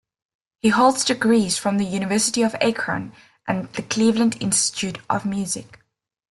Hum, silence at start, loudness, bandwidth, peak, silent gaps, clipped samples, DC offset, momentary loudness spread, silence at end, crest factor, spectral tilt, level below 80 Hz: none; 0.65 s; -21 LUFS; 12.5 kHz; -4 dBFS; none; under 0.1%; under 0.1%; 10 LU; 0.7 s; 18 dB; -3.5 dB/octave; -58 dBFS